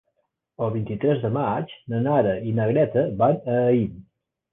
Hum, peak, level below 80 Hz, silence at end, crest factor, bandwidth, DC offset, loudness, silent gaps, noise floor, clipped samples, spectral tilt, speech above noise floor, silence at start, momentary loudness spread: none; -6 dBFS; -54 dBFS; 0.5 s; 16 dB; 3.9 kHz; under 0.1%; -23 LUFS; none; -74 dBFS; under 0.1%; -11.5 dB/octave; 52 dB; 0.6 s; 8 LU